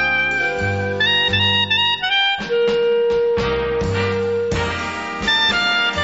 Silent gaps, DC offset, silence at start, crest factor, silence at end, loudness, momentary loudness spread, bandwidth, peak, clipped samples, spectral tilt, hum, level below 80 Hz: none; 0.2%; 0 s; 12 dB; 0 s; -17 LUFS; 6 LU; 8 kHz; -6 dBFS; under 0.1%; -1 dB/octave; none; -40 dBFS